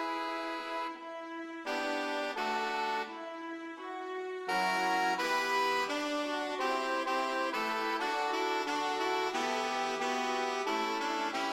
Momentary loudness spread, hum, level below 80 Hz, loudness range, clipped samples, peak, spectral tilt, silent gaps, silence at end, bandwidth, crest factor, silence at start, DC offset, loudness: 11 LU; none; -76 dBFS; 4 LU; under 0.1%; -20 dBFS; -2 dB/octave; none; 0 s; 16 kHz; 14 dB; 0 s; under 0.1%; -33 LUFS